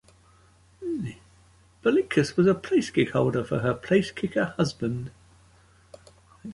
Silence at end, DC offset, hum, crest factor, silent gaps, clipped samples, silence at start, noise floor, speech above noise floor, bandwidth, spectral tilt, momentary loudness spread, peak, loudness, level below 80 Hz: 0 s; under 0.1%; none; 18 dB; none; under 0.1%; 0.8 s; -58 dBFS; 34 dB; 11.5 kHz; -6.5 dB/octave; 13 LU; -8 dBFS; -25 LUFS; -56 dBFS